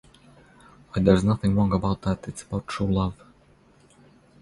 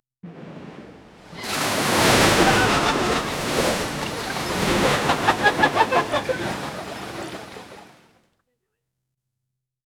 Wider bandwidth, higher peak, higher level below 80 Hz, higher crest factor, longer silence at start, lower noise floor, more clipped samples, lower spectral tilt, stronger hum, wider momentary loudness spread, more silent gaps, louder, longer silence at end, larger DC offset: second, 11.5 kHz vs over 20 kHz; about the same, -4 dBFS vs -4 dBFS; about the same, -42 dBFS vs -44 dBFS; about the same, 22 dB vs 20 dB; first, 0.95 s vs 0.25 s; second, -57 dBFS vs -81 dBFS; neither; first, -7.5 dB/octave vs -3.5 dB/octave; neither; second, 12 LU vs 23 LU; neither; second, -24 LUFS vs -20 LUFS; second, 1.3 s vs 2.15 s; neither